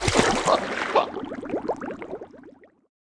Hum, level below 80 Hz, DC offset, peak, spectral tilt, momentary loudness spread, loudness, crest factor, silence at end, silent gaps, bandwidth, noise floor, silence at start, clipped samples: none; -46 dBFS; under 0.1%; -4 dBFS; -3.5 dB/octave; 17 LU; -25 LUFS; 24 dB; 0.55 s; none; 10.5 kHz; -50 dBFS; 0 s; under 0.1%